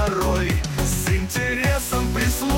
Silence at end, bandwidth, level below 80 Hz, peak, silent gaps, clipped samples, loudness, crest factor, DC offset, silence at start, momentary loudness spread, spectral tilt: 0 s; 16.5 kHz; -28 dBFS; -8 dBFS; none; under 0.1%; -22 LUFS; 12 dB; under 0.1%; 0 s; 2 LU; -4.5 dB/octave